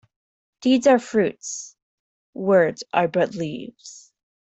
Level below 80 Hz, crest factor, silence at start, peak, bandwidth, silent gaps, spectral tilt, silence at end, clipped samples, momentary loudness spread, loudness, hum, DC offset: -66 dBFS; 18 dB; 0.6 s; -4 dBFS; 8.4 kHz; 1.82-2.33 s; -5 dB/octave; 0.45 s; under 0.1%; 23 LU; -21 LUFS; none; under 0.1%